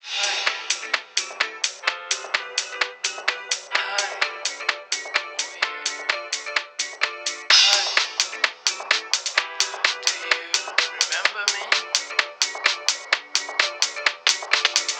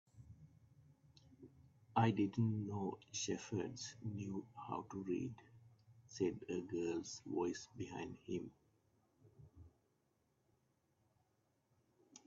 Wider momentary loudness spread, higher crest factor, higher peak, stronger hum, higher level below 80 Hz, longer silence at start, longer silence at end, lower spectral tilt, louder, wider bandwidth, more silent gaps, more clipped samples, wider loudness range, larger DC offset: second, 7 LU vs 26 LU; about the same, 24 dB vs 24 dB; first, 0 dBFS vs -20 dBFS; neither; second, under -90 dBFS vs -78 dBFS; about the same, 0.05 s vs 0.15 s; about the same, 0 s vs 0.1 s; second, 4 dB/octave vs -6.5 dB/octave; first, -22 LUFS vs -43 LUFS; first, 19.5 kHz vs 7.8 kHz; neither; neither; second, 5 LU vs 11 LU; neither